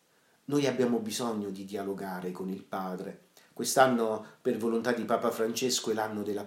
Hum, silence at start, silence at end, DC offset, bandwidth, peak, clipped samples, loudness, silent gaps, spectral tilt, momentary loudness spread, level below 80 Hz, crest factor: none; 0.5 s; 0 s; under 0.1%; 16 kHz; -10 dBFS; under 0.1%; -31 LUFS; none; -4 dB/octave; 12 LU; -80 dBFS; 22 dB